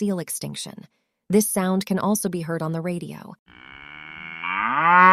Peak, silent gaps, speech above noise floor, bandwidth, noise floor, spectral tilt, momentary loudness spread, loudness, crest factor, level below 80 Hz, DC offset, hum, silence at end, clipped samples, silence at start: 0 dBFS; 3.39-3.46 s; 19 dB; 15.5 kHz; -41 dBFS; -4.5 dB/octave; 20 LU; -23 LUFS; 22 dB; -64 dBFS; under 0.1%; none; 0 s; under 0.1%; 0 s